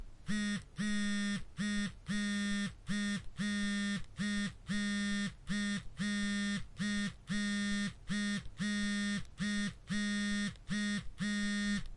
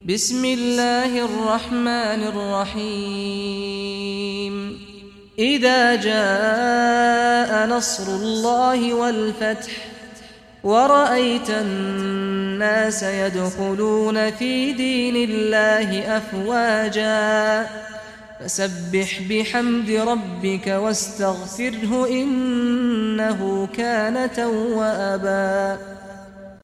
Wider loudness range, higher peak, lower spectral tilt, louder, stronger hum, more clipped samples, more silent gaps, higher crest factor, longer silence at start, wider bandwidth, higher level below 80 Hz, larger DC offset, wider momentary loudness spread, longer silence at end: second, 1 LU vs 5 LU; second, -24 dBFS vs -4 dBFS; about the same, -4 dB/octave vs -4 dB/octave; second, -37 LUFS vs -20 LUFS; neither; neither; neither; about the same, 12 dB vs 16 dB; about the same, 0 s vs 0 s; second, 11.5 kHz vs 14.5 kHz; about the same, -54 dBFS vs -54 dBFS; neither; second, 4 LU vs 10 LU; about the same, 0 s vs 0.05 s